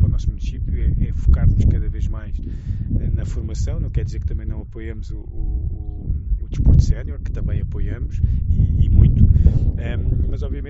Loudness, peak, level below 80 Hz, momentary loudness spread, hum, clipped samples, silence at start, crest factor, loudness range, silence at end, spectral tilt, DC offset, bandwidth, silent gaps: -21 LUFS; 0 dBFS; -20 dBFS; 14 LU; none; under 0.1%; 0 s; 18 dB; 7 LU; 0 s; -10 dB/octave; under 0.1%; 7.6 kHz; none